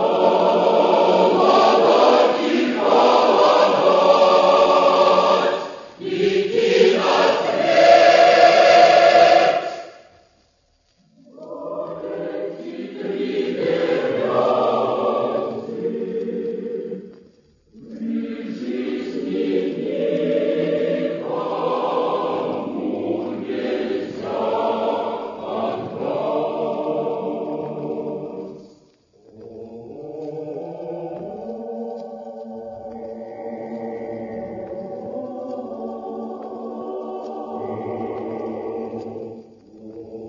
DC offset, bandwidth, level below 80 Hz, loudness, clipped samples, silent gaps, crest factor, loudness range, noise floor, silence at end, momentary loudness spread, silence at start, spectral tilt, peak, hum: under 0.1%; 7.4 kHz; -64 dBFS; -18 LUFS; under 0.1%; none; 18 dB; 18 LU; -62 dBFS; 0 s; 19 LU; 0 s; -5 dB/octave; -2 dBFS; none